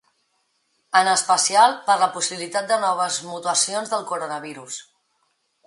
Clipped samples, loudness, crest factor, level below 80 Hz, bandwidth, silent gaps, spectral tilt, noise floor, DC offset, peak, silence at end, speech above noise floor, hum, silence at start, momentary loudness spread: under 0.1%; -20 LUFS; 20 dB; -78 dBFS; 11.5 kHz; none; -0.5 dB/octave; -69 dBFS; under 0.1%; -4 dBFS; 0.85 s; 48 dB; none; 0.95 s; 15 LU